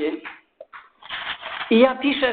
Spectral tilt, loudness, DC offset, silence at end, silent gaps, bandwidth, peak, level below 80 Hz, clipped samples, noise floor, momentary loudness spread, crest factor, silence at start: -9 dB/octave; -21 LUFS; under 0.1%; 0 s; none; 4.7 kHz; -4 dBFS; -60 dBFS; under 0.1%; -45 dBFS; 20 LU; 20 dB; 0 s